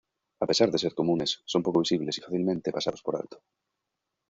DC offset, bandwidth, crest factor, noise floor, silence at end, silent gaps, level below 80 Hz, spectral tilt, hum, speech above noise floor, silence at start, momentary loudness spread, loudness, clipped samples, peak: under 0.1%; 7.8 kHz; 22 dB; -84 dBFS; 0.95 s; none; -66 dBFS; -5 dB/octave; none; 57 dB; 0.4 s; 9 LU; -28 LUFS; under 0.1%; -8 dBFS